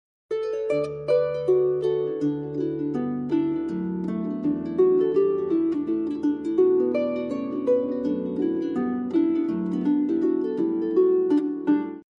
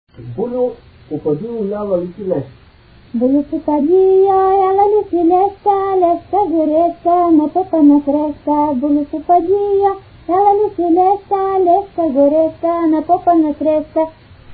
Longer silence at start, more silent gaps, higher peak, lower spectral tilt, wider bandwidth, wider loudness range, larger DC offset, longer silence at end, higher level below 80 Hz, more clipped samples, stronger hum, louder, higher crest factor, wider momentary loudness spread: about the same, 0.3 s vs 0.2 s; neither; second, -10 dBFS vs 0 dBFS; second, -9 dB/octave vs -13 dB/octave; first, 6.4 kHz vs 4.7 kHz; about the same, 2 LU vs 4 LU; neither; first, 0.2 s vs 0 s; second, -62 dBFS vs -46 dBFS; neither; neither; second, -24 LUFS vs -14 LUFS; about the same, 14 dB vs 12 dB; about the same, 7 LU vs 9 LU